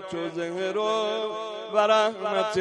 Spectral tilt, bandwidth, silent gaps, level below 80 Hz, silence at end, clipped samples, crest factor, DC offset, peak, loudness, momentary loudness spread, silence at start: -4 dB/octave; 11 kHz; none; -70 dBFS; 0 s; under 0.1%; 18 dB; under 0.1%; -8 dBFS; -26 LUFS; 10 LU; 0 s